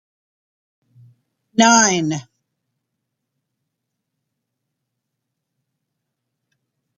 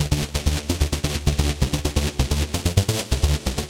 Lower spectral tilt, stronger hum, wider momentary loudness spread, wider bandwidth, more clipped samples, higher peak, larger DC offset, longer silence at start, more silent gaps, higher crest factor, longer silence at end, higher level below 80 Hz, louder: second, -2.5 dB/octave vs -4.5 dB/octave; neither; first, 13 LU vs 2 LU; second, 10 kHz vs 17 kHz; neither; first, 0 dBFS vs -4 dBFS; neither; first, 1.55 s vs 0 s; neither; first, 24 dB vs 18 dB; first, 4.75 s vs 0 s; second, -66 dBFS vs -26 dBFS; first, -15 LUFS vs -23 LUFS